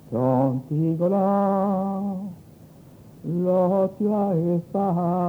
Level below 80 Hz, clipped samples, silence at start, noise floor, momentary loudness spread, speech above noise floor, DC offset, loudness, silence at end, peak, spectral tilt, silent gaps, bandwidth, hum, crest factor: -62 dBFS; under 0.1%; 0.1 s; -47 dBFS; 9 LU; 25 dB; under 0.1%; -23 LUFS; 0 s; -10 dBFS; -11 dB/octave; none; over 20 kHz; none; 14 dB